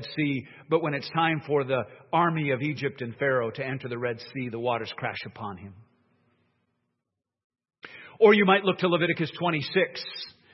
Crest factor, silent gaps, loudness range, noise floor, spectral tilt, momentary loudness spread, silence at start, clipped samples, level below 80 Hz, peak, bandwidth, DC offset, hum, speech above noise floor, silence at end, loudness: 22 dB; 7.44-7.50 s; 11 LU; -84 dBFS; -8 dB/octave; 15 LU; 0 s; under 0.1%; -72 dBFS; -6 dBFS; 6 kHz; under 0.1%; none; 58 dB; 0.25 s; -26 LUFS